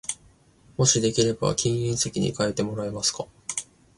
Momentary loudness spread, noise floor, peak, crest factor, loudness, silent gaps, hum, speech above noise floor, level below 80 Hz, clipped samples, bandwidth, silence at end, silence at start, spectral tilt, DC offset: 13 LU; -57 dBFS; -6 dBFS; 20 dB; -25 LUFS; none; none; 32 dB; -52 dBFS; under 0.1%; 11.5 kHz; 0.35 s; 0.1 s; -4 dB/octave; under 0.1%